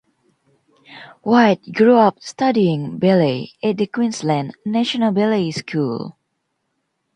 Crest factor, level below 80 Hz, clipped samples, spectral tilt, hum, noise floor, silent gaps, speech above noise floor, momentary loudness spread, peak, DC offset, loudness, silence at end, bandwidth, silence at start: 18 dB; -64 dBFS; under 0.1%; -6.5 dB/octave; none; -72 dBFS; none; 55 dB; 9 LU; 0 dBFS; under 0.1%; -18 LUFS; 1.05 s; 9.8 kHz; 0.9 s